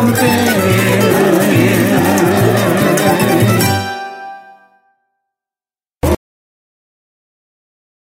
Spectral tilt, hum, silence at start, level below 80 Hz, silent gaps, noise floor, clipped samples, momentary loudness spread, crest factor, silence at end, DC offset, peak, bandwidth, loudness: -5.5 dB/octave; none; 0 s; -36 dBFS; none; under -90 dBFS; under 0.1%; 10 LU; 14 dB; 1.85 s; under 0.1%; 0 dBFS; 16.5 kHz; -12 LUFS